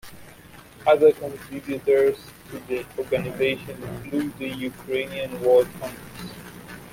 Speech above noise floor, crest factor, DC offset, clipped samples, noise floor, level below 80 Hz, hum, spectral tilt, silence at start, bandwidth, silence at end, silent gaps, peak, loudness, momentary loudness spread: 23 dB; 18 dB; under 0.1%; under 0.1%; -47 dBFS; -56 dBFS; none; -5.5 dB/octave; 0.05 s; 16.5 kHz; 0 s; none; -6 dBFS; -23 LUFS; 19 LU